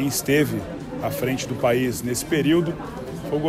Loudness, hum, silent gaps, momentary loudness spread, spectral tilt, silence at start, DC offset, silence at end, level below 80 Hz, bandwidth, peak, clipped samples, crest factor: -23 LUFS; none; none; 12 LU; -5 dB/octave; 0 s; under 0.1%; 0 s; -48 dBFS; 16 kHz; -8 dBFS; under 0.1%; 16 dB